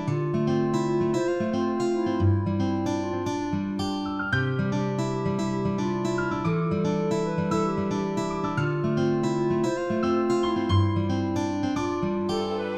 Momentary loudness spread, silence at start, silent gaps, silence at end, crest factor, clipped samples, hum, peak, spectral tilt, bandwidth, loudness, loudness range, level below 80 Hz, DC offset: 4 LU; 0 s; none; 0 s; 14 dB; under 0.1%; none; -10 dBFS; -7 dB/octave; 10.5 kHz; -26 LUFS; 2 LU; -52 dBFS; under 0.1%